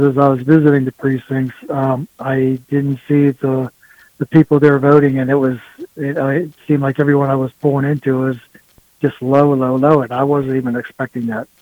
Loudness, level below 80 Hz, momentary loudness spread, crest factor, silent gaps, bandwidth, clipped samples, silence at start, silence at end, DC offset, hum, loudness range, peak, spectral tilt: -15 LUFS; -54 dBFS; 11 LU; 14 dB; none; 19 kHz; under 0.1%; 0 s; 0.15 s; under 0.1%; none; 3 LU; 0 dBFS; -9.5 dB/octave